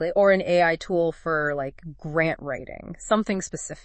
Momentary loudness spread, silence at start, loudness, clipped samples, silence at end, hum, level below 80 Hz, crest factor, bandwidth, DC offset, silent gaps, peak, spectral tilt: 15 LU; 0 s; -24 LUFS; under 0.1%; 0.05 s; none; -50 dBFS; 18 dB; 8.8 kHz; under 0.1%; none; -8 dBFS; -5 dB/octave